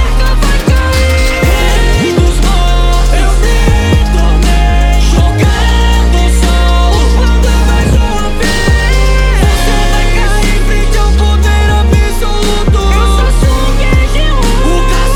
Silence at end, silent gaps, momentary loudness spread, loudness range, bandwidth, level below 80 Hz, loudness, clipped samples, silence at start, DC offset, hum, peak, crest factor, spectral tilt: 0 s; none; 3 LU; 1 LU; 16.5 kHz; -8 dBFS; -10 LUFS; 0.6%; 0 s; under 0.1%; none; 0 dBFS; 8 dB; -5 dB/octave